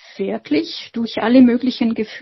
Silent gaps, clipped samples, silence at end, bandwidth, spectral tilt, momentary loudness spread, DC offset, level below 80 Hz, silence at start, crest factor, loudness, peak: none; under 0.1%; 0 s; 6 kHz; -6.5 dB/octave; 13 LU; under 0.1%; -58 dBFS; 0.2 s; 16 dB; -17 LUFS; -2 dBFS